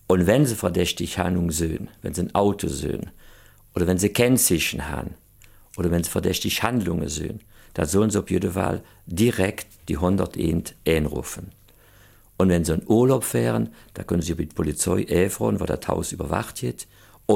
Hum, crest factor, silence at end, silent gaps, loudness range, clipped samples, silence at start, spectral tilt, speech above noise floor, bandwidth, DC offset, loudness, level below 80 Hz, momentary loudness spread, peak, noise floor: none; 18 dB; 0 s; none; 3 LU; under 0.1%; 0.1 s; -5 dB/octave; 30 dB; 17 kHz; under 0.1%; -23 LUFS; -42 dBFS; 14 LU; -4 dBFS; -52 dBFS